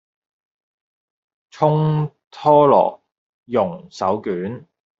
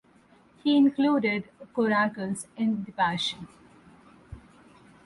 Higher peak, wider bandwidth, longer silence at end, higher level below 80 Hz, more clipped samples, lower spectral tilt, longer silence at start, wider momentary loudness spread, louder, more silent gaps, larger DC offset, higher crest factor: first, -2 dBFS vs -12 dBFS; second, 7.4 kHz vs 11.5 kHz; second, 0.4 s vs 0.65 s; about the same, -62 dBFS vs -62 dBFS; neither; first, -8.5 dB/octave vs -5 dB/octave; first, 1.55 s vs 0.65 s; about the same, 14 LU vs 12 LU; first, -18 LUFS vs -26 LUFS; first, 2.27-2.31 s, 3.18-3.43 s vs none; neither; about the same, 18 dB vs 16 dB